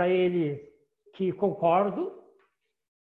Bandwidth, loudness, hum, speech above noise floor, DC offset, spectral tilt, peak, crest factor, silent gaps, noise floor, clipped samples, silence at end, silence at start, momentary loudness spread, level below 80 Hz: 4.1 kHz; -27 LUFS; none; 45 dB; under 0.1%; -9.5 dB/octave; -12 dBFS; 16 dB; none; -71 dBFS; under 0.1%; 0.95 s; 0 s; 11 LU; -72 dBFS